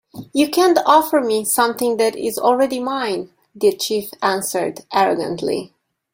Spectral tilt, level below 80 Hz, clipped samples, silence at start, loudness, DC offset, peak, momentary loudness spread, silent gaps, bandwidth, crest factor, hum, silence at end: -3 dB/octave; -62 dBFS; under 0.1%; 0.15 s; -18 LUFS; under 0.1%; -2 dBFS; 10 LU; none; 16.5 kHz; 16 dB; none; 0.5 s